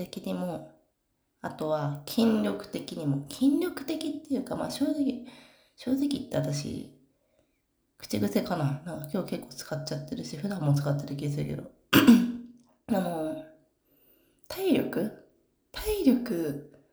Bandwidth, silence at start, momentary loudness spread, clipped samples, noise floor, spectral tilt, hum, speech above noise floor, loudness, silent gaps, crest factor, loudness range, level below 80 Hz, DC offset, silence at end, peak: over 20 kHz; 0 s; 15 LU; under 0.1%; -76 dBFS; -6 dB/octave; none; 48 dB; -29 LUFS; none; 24 dB; 7 LU; -56 dBFS; under 0.1%; 0.25 s; -6 dBFS